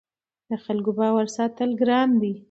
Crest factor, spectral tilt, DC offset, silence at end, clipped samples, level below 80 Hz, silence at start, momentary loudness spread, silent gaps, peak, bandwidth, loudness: 14 dB; -6 dB/octave; under 0.1%; 0.1 s; under 0.1%; -72 dBFS; 0.5 s; 9 LU; none; -8 dBFS; 8 kHz; -23 LUFS